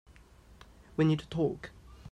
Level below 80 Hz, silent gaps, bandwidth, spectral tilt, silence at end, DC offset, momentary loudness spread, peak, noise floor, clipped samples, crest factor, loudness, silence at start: -56 dBFS; none; 9.2 kHz; -8 dB/octave; 0 s; under 0.1%; 20 LU; -16 dBFS; -57 dBFS; under 0.1%; 18 dB; -31 LUFS; 1 s